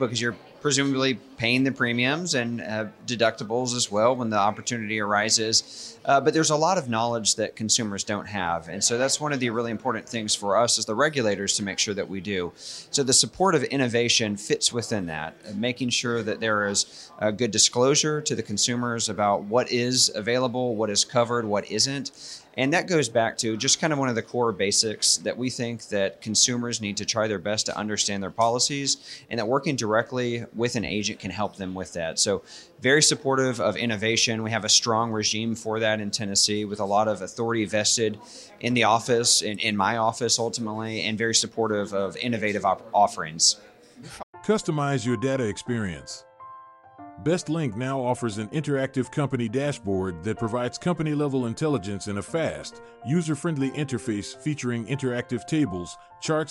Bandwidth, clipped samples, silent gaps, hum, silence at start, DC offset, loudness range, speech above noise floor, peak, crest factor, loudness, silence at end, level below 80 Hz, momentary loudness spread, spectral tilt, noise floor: 13 kHz; under 0.1%; 44.23-44.33 s; none; 0 s; under 0.1%; 5 LU; 22 dB; -6 dBFS; 20 dB; -24 LUFS; 0 s; -62 dBFS; 10 LU; -3 dB/octave; -47 dBFS